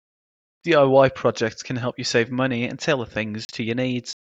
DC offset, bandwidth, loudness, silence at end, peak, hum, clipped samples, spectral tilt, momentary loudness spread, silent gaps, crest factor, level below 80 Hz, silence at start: under 0.1%; 8 kHz; -22 LUFS; 0.2 s; -2 dBFS; none; under 0.1%; -5 dB/octave; 12 LU; 3.45-3.49 s; 20 dB; -58 dBFS; 0.65 s